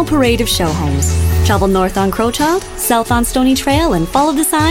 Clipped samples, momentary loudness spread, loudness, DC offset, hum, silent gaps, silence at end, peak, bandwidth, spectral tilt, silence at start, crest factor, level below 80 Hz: under 0.1%; 3 LU; -13 LUFS; under 0.1%; none; none; 0 s; 0 dBFS; 16.5 kHz; -4.5 dB/octave; 0 s; 12 dB; -24 dBFS